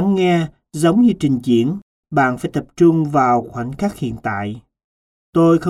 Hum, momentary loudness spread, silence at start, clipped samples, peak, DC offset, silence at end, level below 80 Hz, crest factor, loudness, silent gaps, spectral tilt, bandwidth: none; 12 LU; 0 s; under 0.1%; -2 dBFS; under 0.1%; 0 s; -48 dBFS; 14 dB; -17 LUFS; 1.82-2.03 s, 4.84-5.33 s; -7 dB/octave; 12.5 kHz